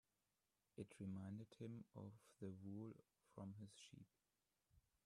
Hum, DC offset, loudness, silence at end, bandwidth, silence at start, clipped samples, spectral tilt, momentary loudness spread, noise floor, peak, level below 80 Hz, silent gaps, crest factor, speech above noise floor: none; under 0.1%; -58 LUFS; 0.25 s; 13 kHz; 0.75 s; under 0.1%; -7 dB/octave; 12 LU; under -90 dBFS; -40 dBFS; -88 dBFS; none; 20 dB; over 34 dB